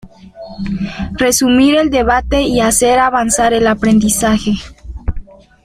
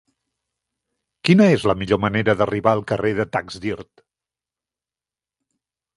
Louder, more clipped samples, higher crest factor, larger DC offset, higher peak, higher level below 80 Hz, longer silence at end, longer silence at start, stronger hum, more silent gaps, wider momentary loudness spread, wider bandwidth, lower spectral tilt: first, -12 LUFS vs -19 LUFS; neither; second, 14 dB vs 20 dB; neither; about the same, 0 dBFS vs 0 dBFS; first, -28 dBFS vs -50 dBFS; second, 0.4 s vs 2.15 s; second, 0.05 s vs 1.25 s; neither; neither; about the same, 15 LU vs 14 LU; first, 16 kHz vs 11.5 kHz; second, -4 dB/octave vs -7 dB/octave